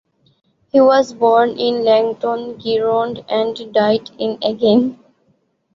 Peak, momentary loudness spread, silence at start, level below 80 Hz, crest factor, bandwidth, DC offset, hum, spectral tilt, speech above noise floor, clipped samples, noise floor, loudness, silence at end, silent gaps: -2 dBFS; 8 LU; 0.75 s; -62 dBFS; 14 dB; 7.4 kHz; under 0.1%; none; -6 dB/octave; 46 dB; under 0.1%; -61 dBFS; -16 LUFS; 0.8 s; none